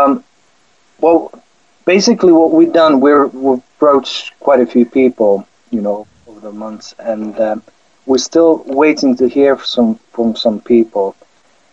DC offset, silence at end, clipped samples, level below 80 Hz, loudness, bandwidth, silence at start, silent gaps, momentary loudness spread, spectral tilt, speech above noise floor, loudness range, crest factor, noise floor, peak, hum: 0.2%; 0.6 s; under 0.1%; -54 dBFS; -12 LUFS; 7.8 kHz; 0 s; none; 14 LU; -5 dB/octave; 43 dB; 6 LU; 12 dB; -55 dBFS; 0 dBFS; none